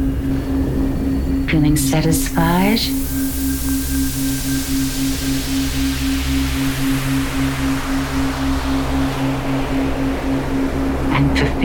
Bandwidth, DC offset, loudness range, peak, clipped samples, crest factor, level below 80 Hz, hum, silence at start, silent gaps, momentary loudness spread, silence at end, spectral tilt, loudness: 19.5 kHz; under 0.1%; 3 LU; -4 dBFS; under 0.1%; 14 dB; -24 dBFS; none; 0 s; none; 5 LU; 0 s; -5 dB/octave; -19 LUFS